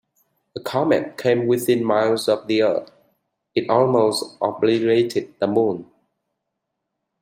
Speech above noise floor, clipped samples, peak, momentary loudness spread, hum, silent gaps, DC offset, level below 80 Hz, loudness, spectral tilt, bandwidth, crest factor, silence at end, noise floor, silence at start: 60 dB; under 0.1%; -2 dBFS; 9 LU; none; none; under 0.1%; -66 dBFS; -20 LUFS; -5.5 dB/octave; 16 kHz; 18 dB; 1.4 s; -79 dBFS; 0.55 s